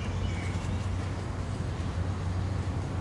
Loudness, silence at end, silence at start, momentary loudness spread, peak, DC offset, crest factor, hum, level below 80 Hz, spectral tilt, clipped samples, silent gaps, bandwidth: -33 LUFS; 0 s; 0 s; 2 LU; -20 dBFS; under 0.1%; 12 dB; none; -40 dBFS; -6.5 dB/octave; under 0.1%; none; 11 kHz